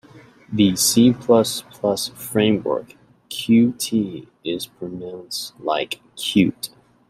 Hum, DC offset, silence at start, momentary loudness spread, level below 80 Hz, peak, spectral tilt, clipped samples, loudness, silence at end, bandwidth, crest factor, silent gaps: none; under 0.1%; 0.15 s; 16 LU; -58 dBFS; -4 dBFS; -4.5 dB/octave; under 0.1%; -20 LUFS; 0.4 s; 16 kHz; 18 dB; none